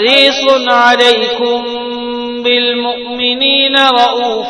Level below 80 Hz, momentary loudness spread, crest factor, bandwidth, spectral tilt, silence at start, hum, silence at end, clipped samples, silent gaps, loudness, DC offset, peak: -54 dBFS; 12 LU; 12 dB; 11 kHz; -2 dB/octave; 0 s; none; 0 s; 0.5%; none; -10 LUFS; under 0.1%; 0 dBFS